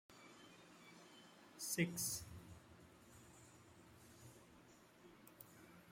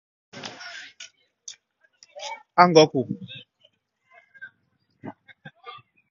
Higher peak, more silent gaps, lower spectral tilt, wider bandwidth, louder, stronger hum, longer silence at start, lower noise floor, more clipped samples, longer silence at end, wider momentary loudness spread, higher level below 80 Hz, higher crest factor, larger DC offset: second, -26 dBFS vs 0 dBFS; neither; second, -3.5 dB/octave vs -5 dB/octave; first, 16 kHz vs 7.4 kHz; second, -44 LUFS vs -19 LUFS; neither; second, 0.1 s vs 0.35 s; second, -66 dBFS vs -70 dBFS; neither; second, 0 s vs 1 s; second, 23 LU vs 28 LU; about the same, -76 dBFS vs -72 dBFS; about the same, 26 dB vs 26 dB; neither